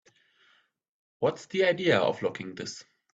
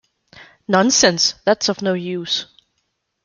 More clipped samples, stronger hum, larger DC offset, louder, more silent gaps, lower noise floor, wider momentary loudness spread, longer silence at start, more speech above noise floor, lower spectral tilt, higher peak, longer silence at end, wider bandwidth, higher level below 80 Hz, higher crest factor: neither; neither; neither; second, -28 LUFS vs -17 LUFS; neither; second, -66 dBFS vs -72 dBFS; first, 15 LU vs 10 LU; first, 1.2 s vs 0.35 s; second, 38 dB vs 54 dB; first, -5 dB/octave vs -2.5 dB/octave; second, -10 dBFS vs -2 dBFS; second, 0.35 s vs 0.8 s; second, 8 kHz vs 11 kHz; second, -70 dBFS vs -60 dBFS; about the same, 20 dB vs 18 dB